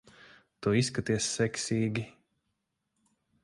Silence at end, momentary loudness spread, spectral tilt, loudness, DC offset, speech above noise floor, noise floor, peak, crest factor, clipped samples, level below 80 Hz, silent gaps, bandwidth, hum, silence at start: 1.35 s; 8 LU; -4.5 dB/octave; -30 LUFS; under 0.1%; 52 dB; -81 dBFS; -14 dBFS; 20 dB; under 0.1%; -60 dBFS; none; 11.5 kHz; none; 0.6 s